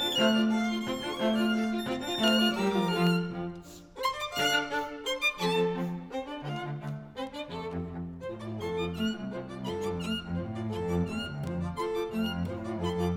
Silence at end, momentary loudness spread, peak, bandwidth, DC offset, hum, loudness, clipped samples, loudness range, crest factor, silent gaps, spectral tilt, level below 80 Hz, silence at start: 0 s; 12 LU; -12 dBFS; 18 kHz; under 0.1%; none; -31 LUFS; under 0.1%; 8 LU; 18 dB; none; -5 dB/octave; -56 dBFS; 0 s